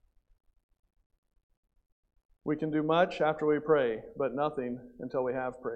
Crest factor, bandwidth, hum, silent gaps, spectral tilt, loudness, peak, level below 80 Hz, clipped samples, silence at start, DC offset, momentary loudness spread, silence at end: 20 dB; 8.2 kHz; none; none; -7.5 dB/octave; -31 LUFS; -12 dBFS; -66 dBFS; under 0.1%; 2.45 s; under 0.1%; 11 LU; 0 s